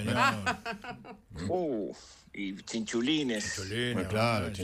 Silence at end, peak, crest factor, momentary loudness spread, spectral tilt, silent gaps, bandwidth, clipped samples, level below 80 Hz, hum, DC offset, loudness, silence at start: 0 s; -14 dBFS; 20 dB; 16 LU; -4.5 dB/octave; none; 15.5 kHz; under 0.1%; -58 dBFS; none; under 0.1%; -32 LUFS; 0 s